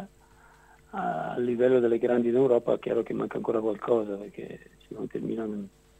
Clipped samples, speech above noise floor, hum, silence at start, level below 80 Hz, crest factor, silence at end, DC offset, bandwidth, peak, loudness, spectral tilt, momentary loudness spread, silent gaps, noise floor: under 0.1%; 30 dB; none; 0 s; -62 dBFS; 18 dB; 0.3 s; under 0.1%; 8.8 kHz; -10 dBFS; -27 LUFS; -8 dB/octave; 18 LU; none; -57 dBFS